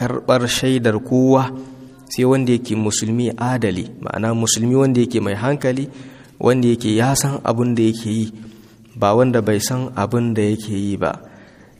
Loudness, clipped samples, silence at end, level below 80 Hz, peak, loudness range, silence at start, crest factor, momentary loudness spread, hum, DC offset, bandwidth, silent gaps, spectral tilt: -18 LUFS; under 0.1%; 0.35 s; -52 dBFS; 0 dBFS; 2 LU; 0 s; 18 dB; 10 LU; none; under 0.1%; 15.5 kHz; none; -5.5 dB/octave